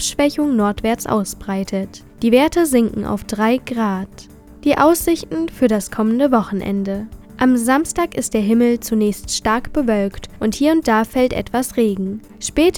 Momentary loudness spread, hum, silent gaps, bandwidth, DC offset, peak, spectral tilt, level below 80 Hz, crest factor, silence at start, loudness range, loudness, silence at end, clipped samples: 10 LU; none; none; 18.5 kHz; under 0.1%; 0 dBFS; -4.5 dB/octave; -40 dBFS; 16 dB; 0 s; 1 LU; -18 LUFS; 0 s; under 0.1%